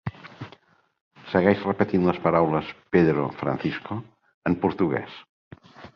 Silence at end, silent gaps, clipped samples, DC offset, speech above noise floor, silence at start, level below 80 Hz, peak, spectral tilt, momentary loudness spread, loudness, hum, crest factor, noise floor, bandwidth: 0.1 s; 1.01-1.11 s, 4.34-4.42 s, 5.29-5.51 s; under 0.1%; under 0.1%; 32 dB; 0.05 s; -52 dBFS; -4 dBFS; -9 dB/octave; 20 LU; -24 LUFS; none; 22 dB; -56 dBFS; 6.4 kHz